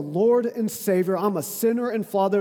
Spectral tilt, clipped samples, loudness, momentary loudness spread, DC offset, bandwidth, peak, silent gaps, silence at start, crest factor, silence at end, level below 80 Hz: -6 dB/octave; under 0.1%; -23 LUFS; 5 LU; under 0.1%; 19.5 kHz; -8 dBFS; none; 0 s; 14 dB; 0 s; -78 dBFS